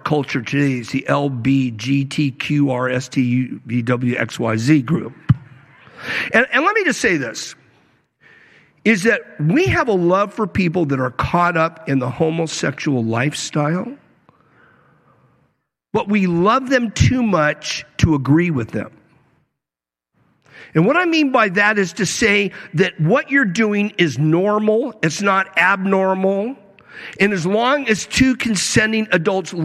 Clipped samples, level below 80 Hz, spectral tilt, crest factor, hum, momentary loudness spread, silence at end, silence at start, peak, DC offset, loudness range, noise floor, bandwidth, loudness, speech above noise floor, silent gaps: under 0.1%; -44 dBFS; -5.5 dB/octave; 18 dB; none; 7 LU; 0 s; 0.05 s; 0 dBFS; under 0.1%; 5 LU; -88 dBFS; 14 kHz; -17 LUFS; 71 dB; none